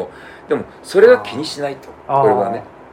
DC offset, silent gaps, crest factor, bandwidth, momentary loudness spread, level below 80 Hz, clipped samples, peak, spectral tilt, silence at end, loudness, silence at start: under 0.1%; none; 16 dB; 14 kHz; 17 LU; -56 dBFS; 0.1%; 0 dBFS; -5.5 dB/octave; 0.3 s; -16 LUFS; 0 s